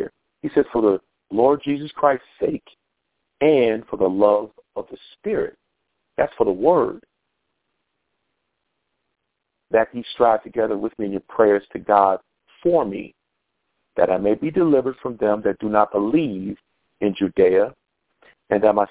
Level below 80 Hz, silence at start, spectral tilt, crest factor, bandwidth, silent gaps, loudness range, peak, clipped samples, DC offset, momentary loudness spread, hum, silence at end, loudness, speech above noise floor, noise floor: -58 dBFS; 0 s; -10.5 dB/octave; 20 dB; 4 kHz; none; 4 LU; -2 dBFS; under 0.1%; under 0.1%; 15 LU; none; 0.05 s; -20 LUFS; 58 dB; -77 dBFS